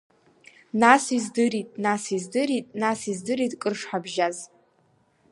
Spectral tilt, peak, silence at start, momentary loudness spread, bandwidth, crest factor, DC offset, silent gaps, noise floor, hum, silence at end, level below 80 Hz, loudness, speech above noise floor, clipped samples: -4 dB/octave; -2 dBFS; 0.75 s; 12 LU; 11.5 kHz; 24 dB; under 0.1%; none; -64 dBFS; none; 0.85 s; -72 dBFS; -24 LUFS; 40 dB; under 0.1%